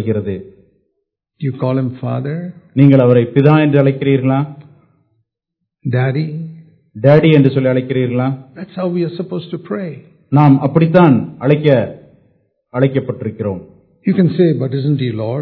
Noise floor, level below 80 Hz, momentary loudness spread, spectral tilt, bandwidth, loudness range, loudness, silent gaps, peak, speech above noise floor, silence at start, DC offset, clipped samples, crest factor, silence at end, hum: -76 dBFS; -56 dBFS; 15 LU; -11 dB/octave; 4.5 kHz; 4 LU; -14 LUFS; none; 0 dBFS; 63 dB; 0 s; under 0.1%; 0.3%; 14 dB; 0 s; none